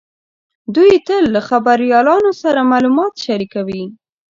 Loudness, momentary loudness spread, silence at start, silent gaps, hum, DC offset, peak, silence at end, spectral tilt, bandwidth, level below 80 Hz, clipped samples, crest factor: -13 LUFS; 12 LU; 0.7 s; none; none; under 0.1%; 0 dBFS; 0.4 s; -6 dB/octave; 7.6 kHz; -54 dBFS; under 0.1%; 14 dB